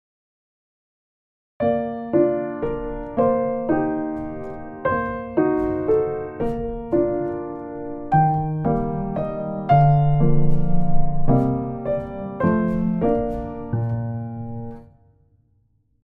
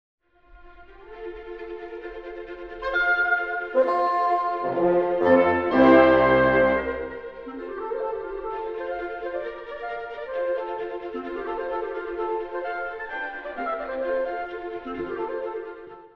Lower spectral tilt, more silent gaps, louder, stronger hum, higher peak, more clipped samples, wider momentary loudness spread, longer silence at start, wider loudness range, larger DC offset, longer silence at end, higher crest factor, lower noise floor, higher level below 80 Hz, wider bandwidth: first, -11.5 dB/octave vs -8 dB/octave; neither; about the same, -22 LUFS vs -24 LUFS; neither; about the same, -4 dBFS vs -4 dBFS; neither; second, 11 LU vs 19 LU; first, 1.6 s vs 0.5 s; second, 4 LU vs 12 LU; neither; first, 1.2 s vs 0.1 s; second, 16 dB vs 22 dB; first, -63 dBFS vs -50 dBFS; first, -34 dBFS vs -50 dBFS; second, 3.8 kHz vs 5.6 kHz